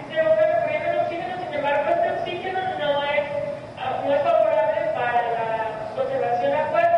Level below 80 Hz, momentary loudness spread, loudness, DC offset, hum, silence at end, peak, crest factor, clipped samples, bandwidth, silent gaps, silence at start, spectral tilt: -60 dBFS; 9 LU; -23 LUFS; under 0.1%; none; 0 s; -8 dBFS; 14 dB; under 0.1%; 8.8 kHz; none; 0 s; -6 dB/octave